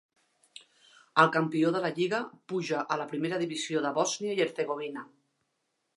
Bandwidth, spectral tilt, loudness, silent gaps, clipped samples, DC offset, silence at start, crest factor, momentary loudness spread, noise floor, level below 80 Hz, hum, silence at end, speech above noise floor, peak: 11.5 kHz; -4.5 dB/octave; -29 LUFS; none; under 0.1%; under 0.1%; 1.15 s; 26 dB; 10 LU; -79 dBFS; -84 dBFS; none; 0.9 s; 50 dB; -6 dBFS